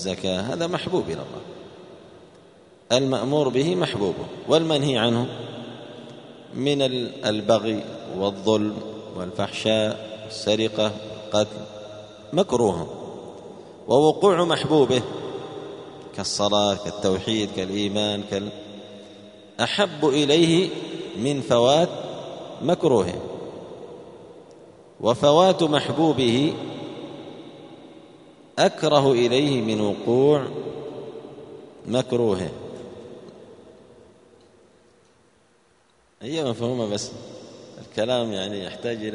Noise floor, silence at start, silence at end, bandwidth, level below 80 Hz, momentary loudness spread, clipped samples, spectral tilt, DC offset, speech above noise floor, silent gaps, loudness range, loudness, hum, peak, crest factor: -61 dBFS; 0 s; 0 s; 10.5 kHz; -60 dBFS; 21 LU; under 0.1%; -5 dB/octave; under 0.1%; 39 dB; none; 8 LU; -23 LUFS; none; -2 dBFS; 22 dB